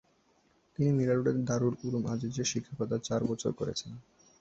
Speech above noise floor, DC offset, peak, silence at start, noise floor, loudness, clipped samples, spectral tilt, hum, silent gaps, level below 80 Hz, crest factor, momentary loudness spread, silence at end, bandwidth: 38 dB; under 0.1%; -16 dBFS; 0.8 s; -69 dBFS; -32 LUFS; under 0.1%; -6 dB/octave; none; none; -62 dBFS; 16 dB; 10 LU; 0.4 s; 8.2 kHz